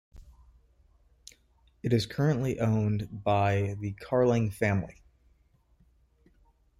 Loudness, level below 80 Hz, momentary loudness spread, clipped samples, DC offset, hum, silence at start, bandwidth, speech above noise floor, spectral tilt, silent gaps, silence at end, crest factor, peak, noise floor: -28 LUFS; -56 dBFS; 8 LU; under 0.1%; under 0.1%; none; 0.15 s; 14 kHz; 38 dB; -7.5 dB/octave; none; 1.9 s; 18 dB; -12 dBFS; -65 dBFS